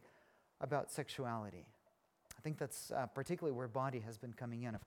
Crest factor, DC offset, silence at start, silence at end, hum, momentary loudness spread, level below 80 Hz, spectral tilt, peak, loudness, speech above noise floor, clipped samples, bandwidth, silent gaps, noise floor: 22 dB; under 0.1%; 0 s; 0 s; none; 9 LU; -76 dBFS; -5.5 dB/octave; -24 dBFS; -44 LUFS; 33 dB; under 0.1%; 19 kHz; none; -76 dBFS